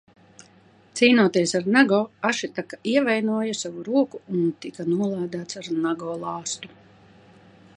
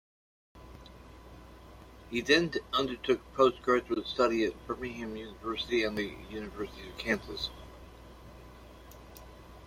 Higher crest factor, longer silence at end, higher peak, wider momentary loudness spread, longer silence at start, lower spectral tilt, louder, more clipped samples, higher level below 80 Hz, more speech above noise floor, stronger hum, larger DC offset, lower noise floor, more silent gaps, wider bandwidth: about the same, 22 dB vs 24 dB; first, 1.1 s vs 0 s; first, -2 dBFS vs -10 dBFS; second, 13 LU vs 26 LU; first, 0.95 s vs 0.55 s; about the same, -4.5 dB/octave vs -4.5 dB/octave; first, -23 LUFS vs -31 LUFS; neither; second, -72 dBFS vs -54 dBFS; first, 32 dB vs 20 dB; neither; neither; about the same, -55 dBFS vs -52 dBFS; neither; second, 11 kHz vs 16 kHz